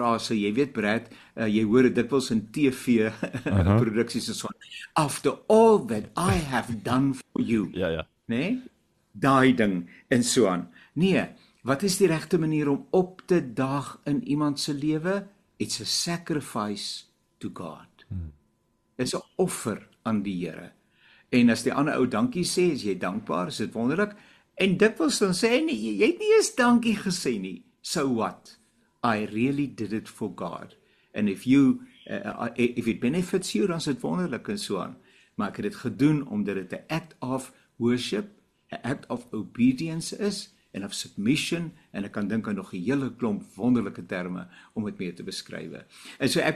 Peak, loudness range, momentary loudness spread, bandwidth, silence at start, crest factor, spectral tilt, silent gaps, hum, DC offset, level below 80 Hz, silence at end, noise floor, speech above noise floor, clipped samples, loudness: -6 dBFS; 7 LU; 15 LU; 13 kHz; 0 s; 20 dB; -5 dB/octave; none; none; under 0.1%; -54 dBFS; 0 s; -70 dBFS; 44 dB; under 0.1%; -26 LUFS